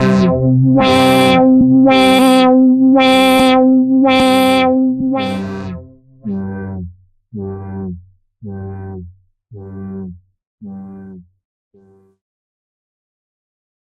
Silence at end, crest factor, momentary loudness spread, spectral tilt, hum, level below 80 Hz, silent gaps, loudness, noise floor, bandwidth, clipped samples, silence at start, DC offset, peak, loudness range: 2.6 s; 12 dB; 23 LU; -6 dB/octave; none; -46 dBFS; 10.47-10.58 s; -10 LUFS; -50 dBFS; 13 kHz; under 0.1%; 0 s; under 0.1%; 0 dBFS; 23 LU